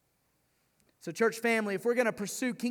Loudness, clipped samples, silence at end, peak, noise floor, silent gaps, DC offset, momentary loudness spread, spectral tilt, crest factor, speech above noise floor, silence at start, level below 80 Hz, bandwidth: -30 LUFS; under 0.1%; 0 s; -14 dBFS; -74 dBFS; none; under 0.1%; 9 LU; -4 dB/octave; 20 dB; 44 dB; 1.05 s; -80 dBFS; 18.5 kHz